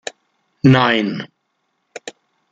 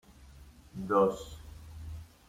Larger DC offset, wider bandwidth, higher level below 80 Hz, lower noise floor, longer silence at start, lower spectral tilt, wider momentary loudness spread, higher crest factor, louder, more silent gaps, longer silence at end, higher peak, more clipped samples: neither; second, 8.8 kHz vs 16 kHz; about the same, -56 dBFS vs -52 dBFS; first, -70 dBFS vs -54 dBFS; first, 0.65 s vs 0.2 s; about the same, -6.5 dB/octave vs -7 dB/octave; first, 24 LU vs 21 LU; about the same, 18 dB vs 20 dB; first, -15 LUFS vs -30 LUFS; neither; first, 0.4 s vs 0.2 s; first, -2 dBFS vs -14 dBFS; neither